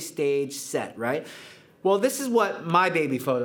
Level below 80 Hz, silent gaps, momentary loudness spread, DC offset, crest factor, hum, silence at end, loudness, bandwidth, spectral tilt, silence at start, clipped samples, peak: -82 dBFS; none; 9 LU; under 0.1%; 20 dB; none; 0 s; -25 LUFS; over 20 kHz; -4.5 dB/octave; 0 s; under 0.1%; -6 dBFS